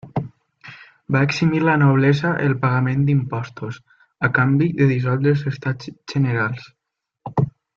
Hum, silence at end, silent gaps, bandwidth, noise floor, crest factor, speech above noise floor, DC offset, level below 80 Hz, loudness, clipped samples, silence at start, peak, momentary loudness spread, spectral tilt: none; 0.3 s; none; 7 kHz; -54 dBFS; 16 dB; 36 dB; under 0.1%; -54 dBFS; -19 LUFS; under 0.1%; 0.05 s; -4 dBFS; 16 LU; -8 dB/octave